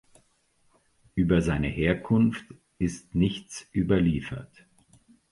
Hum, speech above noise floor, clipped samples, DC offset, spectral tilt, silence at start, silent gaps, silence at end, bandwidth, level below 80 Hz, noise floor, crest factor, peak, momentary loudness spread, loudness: none; 42 dB; under 0.1%; under 0.1%; -7 dB/octave; 1.15 s; none; 0.85 s; 11.5 kHz; -44 dBFS; -67 dBFS; 20 dB; -8 dBFS; 13 LU; -26 LUFS